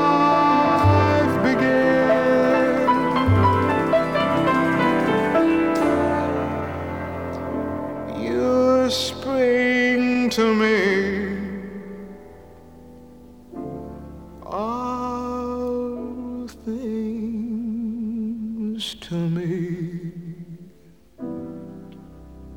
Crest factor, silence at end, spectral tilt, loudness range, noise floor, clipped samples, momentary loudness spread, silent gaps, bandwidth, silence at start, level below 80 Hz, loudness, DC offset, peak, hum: 16 dB; 0 s; -6.5 dB/octave; 12 LU; -52 dBFS; under 0.1%; 18 LU; none; 17 kHz; 0 s; -48 dBFS; -21 LUFS; 0.2%; -6 dBFS; none